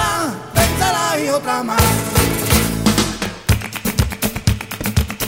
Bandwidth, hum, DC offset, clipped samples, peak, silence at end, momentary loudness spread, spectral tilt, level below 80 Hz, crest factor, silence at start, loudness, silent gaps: 16.5 kHz; none; 0.1%; under 0.1%; 0 dBFS; 0 s; 6 LU; -4 dB/octave; -28 dBFS; 18 dB; 0 s; -17 LUFS; none